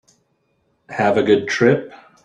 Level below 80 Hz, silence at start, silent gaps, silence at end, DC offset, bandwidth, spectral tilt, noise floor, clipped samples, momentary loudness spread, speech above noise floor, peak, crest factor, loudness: -60 dBFS; 0.9 s; none; 0.3 s; under 0.1%; 9.2 kHz; -6 dB/octave; -66 dBFS; under 0.1%; 14 LU; 49 dB; -2 dBFS; 18 dB; -17 LUFS